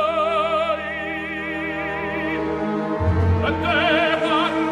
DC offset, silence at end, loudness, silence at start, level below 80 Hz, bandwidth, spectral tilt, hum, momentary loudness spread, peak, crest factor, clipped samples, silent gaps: under 0.1%; 0 s; -21 LUFS; 0 s; -42 dBFS; 10.5 kHz; -6.5 dB/octave; none; 8 LU; -6 dBFS; 16 dB; under 0.1%; none